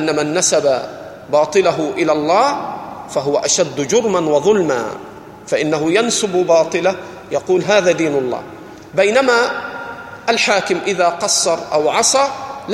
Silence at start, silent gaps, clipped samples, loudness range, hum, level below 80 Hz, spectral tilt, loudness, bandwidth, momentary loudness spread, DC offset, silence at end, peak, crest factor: 0 s; none; under 0.1%; 1 LU; none; -56 dBFS; -3 dB/octave; -15 LUFS; 15.5 kHz; 14 LU; under 0.1%; 0 s; 0 dBFS; 16 dB